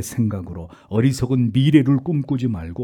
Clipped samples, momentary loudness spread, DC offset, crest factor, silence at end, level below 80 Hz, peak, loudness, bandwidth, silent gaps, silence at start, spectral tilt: under 0.1%; 13 LU; under 0.1%; 18 dB; 0 s; -48 dBFS; -2 dBFS; -19 LUFS; 17.5 kHz; none; 0 s; -7 dB/octave